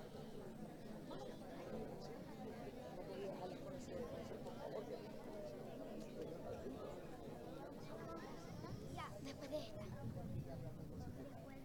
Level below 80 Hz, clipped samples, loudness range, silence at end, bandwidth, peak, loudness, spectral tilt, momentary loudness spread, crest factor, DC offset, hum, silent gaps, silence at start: -66 dBFS; under 0.1%; 1 LU; 0 s; 19 kHz; -34 dBFS; -52 LUFS; -6.5 dB/octave; 5 LU; 18 dB; under 0.1%; none; none; 0 s